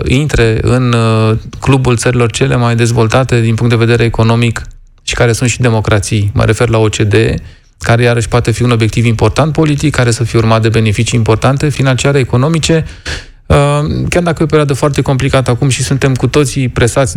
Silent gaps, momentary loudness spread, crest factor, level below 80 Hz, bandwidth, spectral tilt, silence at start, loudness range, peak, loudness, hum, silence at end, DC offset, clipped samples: none; 3 LU; 10 dB; -28 dBFS; 13 kHz; -5.5 dB/octave; 0 s; 1 LU; 0 dBFS; -11 LUFS; none; 0 s; under 0.1%; under 0.1%